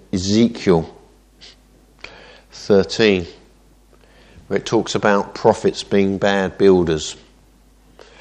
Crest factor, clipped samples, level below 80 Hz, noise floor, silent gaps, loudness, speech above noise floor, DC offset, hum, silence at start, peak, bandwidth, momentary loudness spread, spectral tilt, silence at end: 20 dB; under 0.1%; -48 dBFS; -51 dBFS; none; -17 LUFS; 34 dB; under 0.1%; none; 0.15 s; 0 dBFS; 9.8 kHz; 21 LU; -5.5 dB/octave; 1.05 s